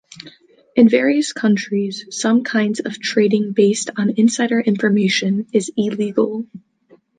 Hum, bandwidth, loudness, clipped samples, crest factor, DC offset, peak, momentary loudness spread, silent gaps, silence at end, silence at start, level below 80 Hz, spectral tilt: none; 9.6 kHz; -17 LUFS; under 0.1%; 16 dB; under 0.1%; -2 dBFS; 8 LU; none; 0.6 s; 0.15 s; -66 dBFS; -5 dB/octave